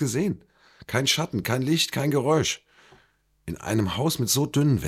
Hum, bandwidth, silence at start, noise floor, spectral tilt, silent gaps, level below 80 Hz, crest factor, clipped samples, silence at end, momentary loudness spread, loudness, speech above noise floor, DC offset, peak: none; 16 kHz; 0 s; -64 dBFS; -4.5 dB/octave; none; -52 dBFS; 16 dB; under 0.1%; 0 s; 12 LU; -24 LUFS; 40 dB; under 0.1%; -8 dBFS